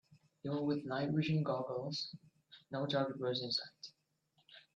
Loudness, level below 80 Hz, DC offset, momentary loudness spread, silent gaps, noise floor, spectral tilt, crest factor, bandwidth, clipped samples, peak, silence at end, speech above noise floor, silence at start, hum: -38 LUFS; -78 dBFS; under 0.1%; 14 LU; none; -78 dBFS; -6.5 dB/octave; 18 dB; 7.6 kHz; under 0.1%; -22 dBFS; 0.15 s; 40 dB; 0.1 s; none